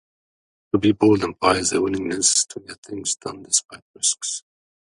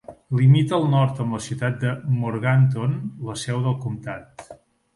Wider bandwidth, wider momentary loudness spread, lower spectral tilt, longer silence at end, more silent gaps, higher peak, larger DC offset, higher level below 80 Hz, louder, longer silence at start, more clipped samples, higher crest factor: about the same, 11.5 kHz vs 11.5 kHz; second, 11 LU vs 14 LU; second, -3 dB/octave vs -7 dB/octave; first, 0.55 s vs 0.4 s; first, 2.78-2.83 s, 3.82-3.94 s vs none; first, -2 dBFS vs -6 dBFS; neither; about the same, -52 dBFS vs -56 dBFS; about the same, -20 LUFS vs -22 LUFS; first, 0.75 s vs 0.1 s; neither; first, 22 dB vs 16 dB